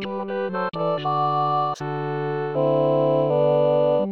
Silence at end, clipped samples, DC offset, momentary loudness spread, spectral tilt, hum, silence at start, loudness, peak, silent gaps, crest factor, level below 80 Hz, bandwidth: 0 s; under 0.1%; 0.3%; 8 LU; -8 dB/octave; none; 0 s; -22 LUFS; -8 dBFS; none; 14 dB; -66 dBFS; 7 kHz